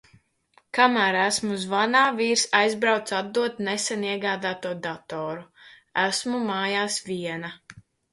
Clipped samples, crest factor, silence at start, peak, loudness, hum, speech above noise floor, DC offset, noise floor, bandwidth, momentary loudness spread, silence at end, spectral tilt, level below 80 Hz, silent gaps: under 0.1%; 22 dB; 0.75 s; -4 dBFS; -24 LUFS; none; 38 dB; under 0.1%; -63 dBFS; 11.5 kHz; 12 LU; 0.3 s; -2.5 dB/octave; -70 dBFS; none